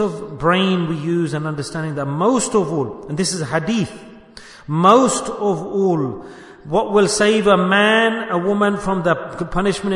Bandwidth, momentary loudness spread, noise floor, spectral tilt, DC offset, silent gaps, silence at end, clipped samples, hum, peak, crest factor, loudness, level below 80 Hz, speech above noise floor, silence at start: 11 kHz; 11 LU; -41 dBFS; -5 dB/octave; under 0.1%; none; 0 s; under 0.1%; none; 0 dBFS; 18 dB; -18 LUFS; -46 dBFS; 23 dB; 0 s